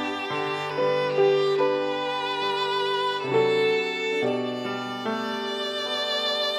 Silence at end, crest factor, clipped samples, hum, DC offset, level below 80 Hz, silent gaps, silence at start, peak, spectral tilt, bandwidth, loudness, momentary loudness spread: 0 s; 14 dB; under 0.1%; none; under 0.1%; -80 dBFS; none; 0 s; -10 dBFS; -4 dB/octave; 14 kHz; -25 LUFS; 7 LU